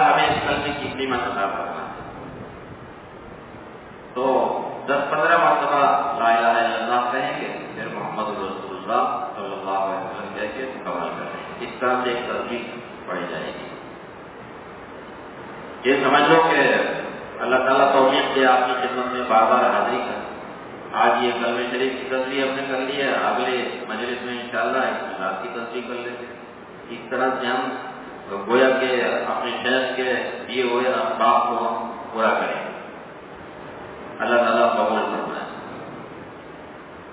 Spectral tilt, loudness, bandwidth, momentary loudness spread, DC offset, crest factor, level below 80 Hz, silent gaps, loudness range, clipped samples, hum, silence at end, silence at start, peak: -8 dB/octave; -22 LUFS; 4 kHz; 21 LU; under 0.1%; 20 dB; -56 dBFS; none; 9 LU; under 0.1%; none; 0 s; 0 s; -2 dBFS